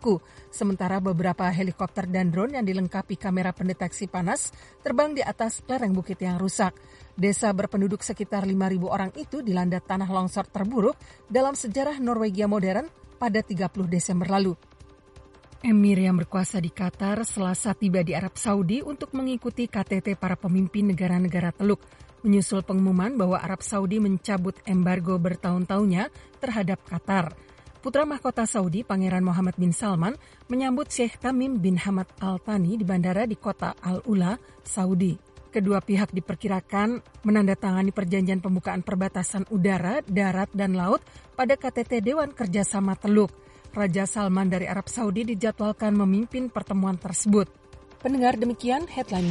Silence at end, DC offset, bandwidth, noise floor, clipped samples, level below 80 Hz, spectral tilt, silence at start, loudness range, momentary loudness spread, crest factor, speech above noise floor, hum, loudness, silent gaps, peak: 0 s; under 0.1%; 11.5 kHz; -51 dBFS; under 0.1%; -54 dBFS; -6 dB/octave; 0 s; 2 LU; 7 LU; 18 dB; 26 dB; none; -26 LUFS; none; -8 dBFS